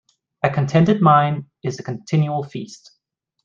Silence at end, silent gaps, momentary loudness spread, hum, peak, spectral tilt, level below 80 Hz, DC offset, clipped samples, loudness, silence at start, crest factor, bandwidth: 0.7 s; none; 17 LU; none; -2 dBFS; -7.5 dB/octave; -56 dBFS; under 0.1%; under 0.1%; -18 LUFS; 0.45 s; 18 dB; 7.4 kHz